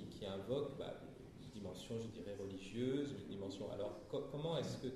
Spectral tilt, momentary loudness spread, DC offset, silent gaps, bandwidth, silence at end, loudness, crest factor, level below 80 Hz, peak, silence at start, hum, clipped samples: -6.5 dB/octave; 10 LU; under 0.1%; none; 14 kHz; 0 s; -46 LUFS; 16 dB; -68 dBFS; -30 dBFS; 0 s; none; under 0.1%